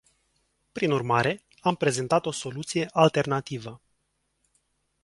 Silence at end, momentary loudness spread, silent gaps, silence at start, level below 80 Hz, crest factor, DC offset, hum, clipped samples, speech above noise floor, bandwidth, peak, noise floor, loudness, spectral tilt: 1.25 s; 14 LU; none; 0.75 s; -64 dBFS; 24 dB; under 0.1%; none; under 0.1%; 50 dB; 11.5 kHz; -4 dBFS; -75 dBFS; -26 LUFS; -5 dB/octave